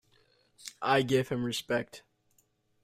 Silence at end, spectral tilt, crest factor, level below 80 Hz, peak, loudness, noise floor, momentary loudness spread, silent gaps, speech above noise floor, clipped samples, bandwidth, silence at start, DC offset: 0.85 s; -5 dB/octave; 20 dB; -66 dBFS; -12 dBFS; -30 LUFS; -71 dBFS; 20 LU; none; 42 dB; under 0.1%; 16 kHz; 0.65 s; under 0.1%